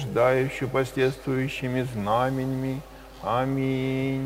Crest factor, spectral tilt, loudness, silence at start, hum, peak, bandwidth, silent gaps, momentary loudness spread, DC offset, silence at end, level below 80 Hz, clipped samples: 18 dB; -7 dB/octave; -26 LUFS; 0 s; none; -8 dBFS; 16 kHz; none; 8 LU; under 0.1%; 0 s; -50 dBFS; under 0.1%